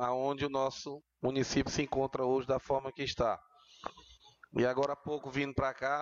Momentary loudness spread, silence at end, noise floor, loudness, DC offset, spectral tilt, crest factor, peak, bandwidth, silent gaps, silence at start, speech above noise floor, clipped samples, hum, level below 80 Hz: 12 LU; 0 s; -60 dBFS; -34 LUFS; under 0.1%; -5 dB/octave; 14 dB; -20 dBFS; 7.6 kHz; none; 0 s; 26 dB; under 0.1%; none; -56 dBFS